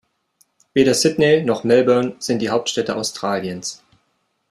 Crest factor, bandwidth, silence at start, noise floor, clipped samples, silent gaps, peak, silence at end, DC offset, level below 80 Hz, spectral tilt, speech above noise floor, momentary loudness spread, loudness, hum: 16 dB; 13.5 kHz; 0.75 s; -68 dBFS; under 0.1%; none; -2 dBFS; 0.75 s; under 0.1%; -58 dBFS; -4 dB/octave; 51 dB; 9 LU; -18 LUFS; none